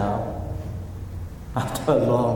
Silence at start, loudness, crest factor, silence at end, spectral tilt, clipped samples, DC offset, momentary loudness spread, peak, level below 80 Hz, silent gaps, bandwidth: 0 s; -26 LUFS; 18 dB; 0 s; -7 dB/octave; under 0.1%; under 0.1%; 15 LU; -6 dBFS; -38 dBFS; none; 17.5 kHz